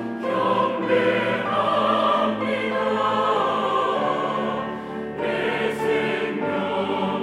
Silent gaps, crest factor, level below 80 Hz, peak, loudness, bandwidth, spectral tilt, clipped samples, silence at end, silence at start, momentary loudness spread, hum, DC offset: none; 14 dB; -60 dBFS; -8 dBFS; -22 LUFS; 13.5 kHz; -6 dB/octave; under 0.1%; 0 s; 0 s; 6 LU; none; under 0.1%